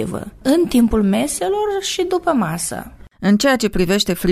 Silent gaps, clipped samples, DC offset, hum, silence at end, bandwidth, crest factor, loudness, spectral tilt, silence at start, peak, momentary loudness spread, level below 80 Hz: none; under 0.1%; under 0.1%; none; 0 s; 16 kHz; 16 dB; -17 LUFS; -4.5 dB/octave; 0 s; -2 dBFS; 8 LU; -36 dBFS